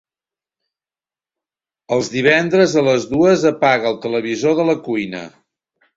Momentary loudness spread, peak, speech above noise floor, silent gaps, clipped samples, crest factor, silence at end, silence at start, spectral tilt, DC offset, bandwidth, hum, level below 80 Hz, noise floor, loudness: 9 LU; 0 dBFS; over 74 dB; none; under 0.1%; 18 dB; 0.7 s; 1.9 s; -5 dB/octave; under 0.1%; 7.8 kHz; none; -56 dBFS; under -90 dBFS; -16 LUFS